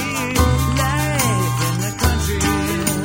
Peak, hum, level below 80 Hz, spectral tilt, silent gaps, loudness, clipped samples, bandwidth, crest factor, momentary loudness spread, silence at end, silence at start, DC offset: -2 dBFS; none; -26 dBFS; -4.5 dB/octave; none; -18 LUFS; under 0.1%; 16.5 kHz; 16 dB; 3 LU; 0 s; 0 s; under 0.1%